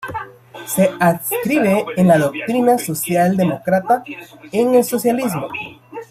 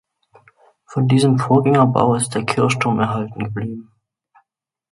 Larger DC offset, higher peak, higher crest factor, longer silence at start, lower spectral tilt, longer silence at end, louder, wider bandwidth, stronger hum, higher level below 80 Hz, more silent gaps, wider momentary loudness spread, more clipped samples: neither; about the same, -2 dBFS vs 0 dBFS; about the same, 16 dB vs 18 dB; second, 0 s vs 0.9 s; about the same, -6 dB/octave vs -6 dB/octave; second, 0.05 s vs 1.1 s; about the same, -17 LUFS vs -17 LUFS; first, 16 kHz vs 11.5 kHz; neither; about the same, -58 dBFS vs -56 dBFS; neither; first, 16 LU vs 13 LU; neither